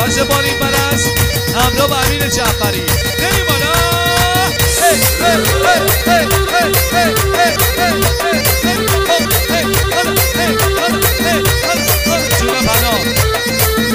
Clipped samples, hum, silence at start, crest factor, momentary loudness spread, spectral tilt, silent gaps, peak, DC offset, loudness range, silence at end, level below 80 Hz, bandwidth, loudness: under 0.1%; none; 0 s; 12 dB; 2 LU; -3.5 dB/octave; none; 0 dBFS; under 0.1%; 2 LU; 0 s; -24 dBFS; 16 kHz; -12 LUFS